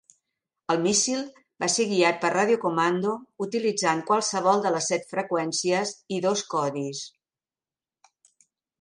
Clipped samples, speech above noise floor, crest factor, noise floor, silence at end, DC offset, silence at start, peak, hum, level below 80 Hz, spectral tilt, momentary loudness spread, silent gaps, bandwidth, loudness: under 0.1%; over 65 dB; 18 dB; under -90 dBFS; 1.75 s; under 0.1%; 0.7 s; -8 dBFS; none; -74 dBFS; -3 dB/octave; 10 LU; none; 11.5 kHz; -25 LUFS